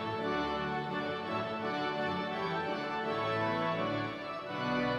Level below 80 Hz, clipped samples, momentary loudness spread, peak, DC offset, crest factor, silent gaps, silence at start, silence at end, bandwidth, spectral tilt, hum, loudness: -64 dBFS; under 0.1%; 4 LU; -20 dBFS; under 0.1%; 14 dB; none; 0 s; 0 s; 13.5 kHz; -6.5 dB/octave; none; -34 LUFS